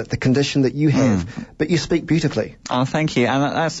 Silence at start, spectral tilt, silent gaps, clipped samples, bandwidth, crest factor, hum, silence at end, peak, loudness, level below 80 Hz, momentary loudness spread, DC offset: 0 s; -6 dB/octave; none; under 0.1%; 8 kHz; 12 dB; none; 0 s; -6 dBFS; -19 LUFS; -46 dBFS; 6 LU; under 0.1%